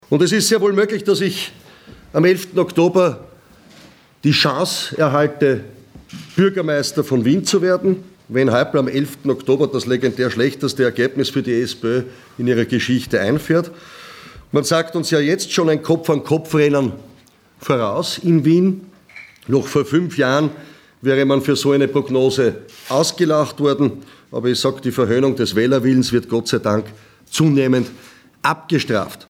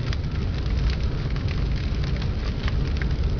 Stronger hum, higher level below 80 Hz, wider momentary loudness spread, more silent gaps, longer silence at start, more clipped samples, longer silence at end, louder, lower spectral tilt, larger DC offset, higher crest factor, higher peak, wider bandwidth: neither; second, -58 dBFS vs -26 dBFS; first, 9 LU vs 2 LU; neither; about the same, 0.1 s vs 0 s; neither; first, 0.15 s vs 0 s; first, -17 LUFS vs -27 LUFS; second, -5.5 dB/octave vs -7 dB/octave; neither; about the same, 16 dB vs 12 dB; first, -2 dBFS vs -12 dBFS; first, 16.5 kHz vs 5.4 kHz